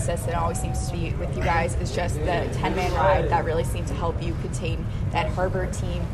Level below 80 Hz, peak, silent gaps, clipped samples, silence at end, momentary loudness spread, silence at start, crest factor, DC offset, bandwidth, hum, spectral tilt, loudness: -32 dBFS; -8 dBFS; none; under 0.1%; 0 s; 7 LU; 0 s; 16 dB; under 0.1%; 13.5 kHz; none; -6 dB/octave; -25 LUFS